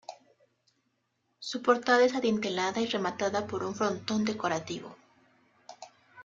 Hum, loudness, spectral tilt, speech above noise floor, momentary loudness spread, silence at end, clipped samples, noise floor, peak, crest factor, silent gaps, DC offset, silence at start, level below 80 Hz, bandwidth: none; -29 LUFS; -4 dB/octave; 48 dB; 24 LU; 0 s; under 0.1%; -77 dBFS; -8 dBFS; 22 dB; none; under 0.1%; 0.1 s; -72 dBFS; 7.8 kHz